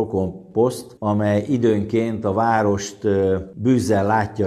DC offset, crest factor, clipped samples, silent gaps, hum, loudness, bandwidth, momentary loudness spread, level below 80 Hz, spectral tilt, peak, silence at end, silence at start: under 0.1%; 14 dB; under 0.1%; none; none; -20 LUFS; 14 kHz; 5 LU; -52 dBFS; -7 dB/octave; -4 dBFS; 0 s; 0 s